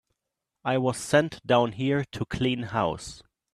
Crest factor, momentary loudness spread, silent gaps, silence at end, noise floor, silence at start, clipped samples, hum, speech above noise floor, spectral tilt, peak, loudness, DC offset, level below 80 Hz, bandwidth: 20 dB; 10 LU; none; 0.35 s; -85 dBFS; 0.65 s; under 0.1%; none; 59 dB; -5.5 dB/octave; -6 dBFS; -26 LUFS; under 0.1%; -54 dBFS; 13.5 kHz